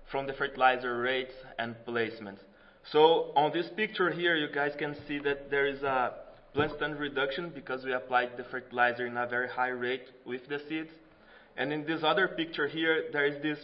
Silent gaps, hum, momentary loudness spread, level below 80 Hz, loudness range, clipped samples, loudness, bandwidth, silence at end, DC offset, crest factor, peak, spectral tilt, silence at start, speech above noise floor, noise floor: none; none; 11 LU; -62 dBFS; 4 LU; under 0.1%; -31 LUFS; 5.8 kHz; 0 s; under 0.1%; 24 dB; -8 dBFS; -8.5 dB/octave; 0 s; 26 dB; -57 dBFS